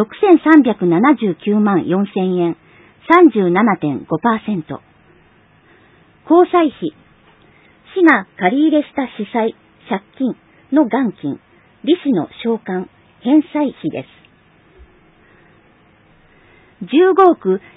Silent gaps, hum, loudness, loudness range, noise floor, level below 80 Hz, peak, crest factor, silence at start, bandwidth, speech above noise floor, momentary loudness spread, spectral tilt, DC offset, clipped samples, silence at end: none; none; -15 LUFS; 7 LU; -51 dBFS; -60 dBFS; 0 dBFS; 16 dB; 0 s; 4 kHz; 37 dB; 15 LU; -9 dB/octave; under 0.1%; under 0.1%; 0.2 s